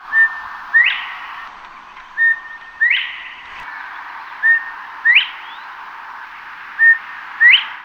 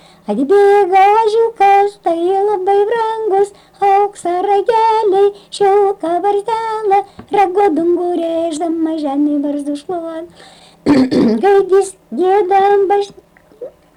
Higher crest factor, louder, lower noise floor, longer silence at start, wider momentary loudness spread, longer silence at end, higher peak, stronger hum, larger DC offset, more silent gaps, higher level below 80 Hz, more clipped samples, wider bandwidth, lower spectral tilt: first, 18 dB vs 8 dB; about the same, -13 LUFS vs -13 LUFS; about the same, -37 dBFS vs -34 dBFS; second, 0.05 s vs 0.3 s; first, 21 LU vs 11 LU; second, 0 s vs 0.25 s; first, 0 dBFS vs -4 dBFS; neither; neither; neither; second, -62 dBFS vs -54 dBFS; neither; second, 6.6 kHz vs 11 kHz; second, 0.5 dB/octave vs -5.5 dB/octave